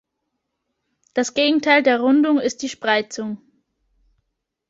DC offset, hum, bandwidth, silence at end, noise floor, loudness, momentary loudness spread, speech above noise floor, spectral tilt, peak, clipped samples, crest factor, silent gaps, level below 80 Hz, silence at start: under 0.1%; none; 7.8 kHz; 1.35 s; -77 dBFS; -19 LUFS; 14 LU; 59 dB; -3 dB/octave; -2 dBFS; under 0.1%; 18 dB; none; -66 dBFS; 1.15 s